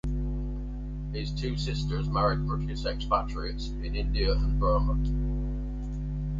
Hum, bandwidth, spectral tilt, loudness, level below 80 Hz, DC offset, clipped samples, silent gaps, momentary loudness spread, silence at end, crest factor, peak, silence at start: 50 Hz at -30 dBFS; 7.6 kHz; -7 dB/octave; -30 LUFS; -30 dBFS; under 0.1%; under 0.1%; none; 9 LU; 0 s; 16 dB; -12 dBFS; 0.05 s